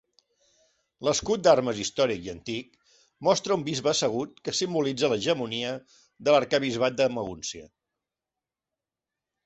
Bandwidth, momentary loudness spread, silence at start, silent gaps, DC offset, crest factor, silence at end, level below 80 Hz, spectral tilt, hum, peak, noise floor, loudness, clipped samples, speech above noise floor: 8.4 kHz; 12 LU; 1 s; none; under 0.1%; 22 dB; 1.8 s; -62 dBFS; -3.5 dB/octave; none; -6 dBFS; -89 dBFS; -26 LUFS; under 0.1%; 63 dB